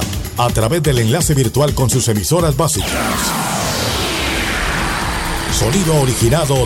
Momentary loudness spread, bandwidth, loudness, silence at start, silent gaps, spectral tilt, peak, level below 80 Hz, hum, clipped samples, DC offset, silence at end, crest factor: 4 LU; 16.5 kHz; -15 LUFS; 0 s; none; -4.5 dB/octave; -2 dBFS; -28 dBFS; none; under 0.1%; under 0.1%; 0 s; 12 dB